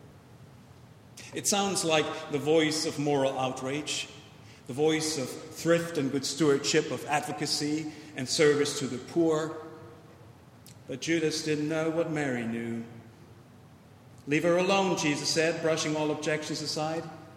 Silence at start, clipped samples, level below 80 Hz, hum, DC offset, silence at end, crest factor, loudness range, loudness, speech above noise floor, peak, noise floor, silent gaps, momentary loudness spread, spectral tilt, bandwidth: 0.05 s; under 0.1%; -70 dBFS; none; under 0.1%; 0 s; 20 dB; 4 LU; -28 LUFS; 25 dB; -10 dBFS; -53 dBFS; none; 14 LU; -4 dB/octave; 16 kHz